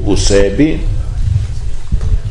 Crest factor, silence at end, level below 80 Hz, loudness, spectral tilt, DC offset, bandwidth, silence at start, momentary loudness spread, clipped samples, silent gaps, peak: 12 dB; 0 s; -16 dBFS; -15 LUFS; -5.5 dB/octave; under 0.1%; 11 kHz; 0 s; 11 LU; under 0.1%; none; 0 dBFS